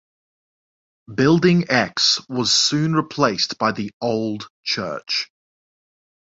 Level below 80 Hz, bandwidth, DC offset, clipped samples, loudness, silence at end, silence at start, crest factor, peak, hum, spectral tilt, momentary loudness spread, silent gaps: -58 dBFS; 8 kHz; under 0.1%; under 0.1%; -19 LUFS; 1.05 s; 1.1 s; 18 dB; -2 dBFS; none; -4 dB/octave; 9 LU; 3.93-4.00 s, 4.50-4.63 s